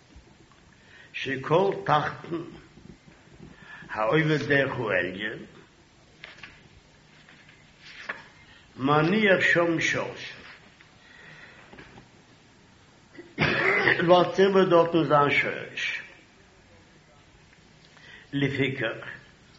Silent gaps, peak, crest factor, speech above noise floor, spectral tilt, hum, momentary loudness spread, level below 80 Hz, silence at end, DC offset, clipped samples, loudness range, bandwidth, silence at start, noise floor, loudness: none; -6 dBFS; 22 dB; 33 dB; -3.5 dB/octave; none; 25 LU; -62 dBFS; 0.4 s; under 0.1%; under 0.1%; 13 LU; 7.6 kHz; 0.15 s; -56 dBFS; -24 LUFS